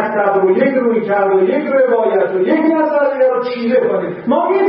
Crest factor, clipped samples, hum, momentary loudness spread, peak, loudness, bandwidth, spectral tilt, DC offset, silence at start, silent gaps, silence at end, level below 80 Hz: 12 dB; under 0.1%; none; 3 LU; -2 dBFS; -14 LUFS; 5.6 kHz; -11.5 dB/octave; under 0.1%; 0 s; none; 0 s; -62 dBFS